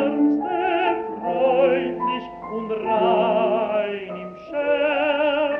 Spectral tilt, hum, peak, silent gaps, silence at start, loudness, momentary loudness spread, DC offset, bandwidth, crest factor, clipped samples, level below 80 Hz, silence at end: -8 dB/octave; none; -6 dBFS; none; 0 s; -22 LUFS; 11 LU; under 0.1%; 5.4 kHz; 14 dB; under 0.1%; -60 dBFS; 0 s